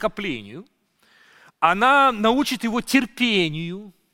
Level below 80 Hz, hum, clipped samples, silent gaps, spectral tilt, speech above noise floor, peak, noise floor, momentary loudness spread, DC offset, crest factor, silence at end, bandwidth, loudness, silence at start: -52 dBFS; none; under 0.1%; none; -4 dB/octave; 38 dB; -2 dBFS; -59 dBFS; 17 LU; under 0.1%; 20 dB; 0.25 s; 16.5 kHz; -20 LUFS; 0 s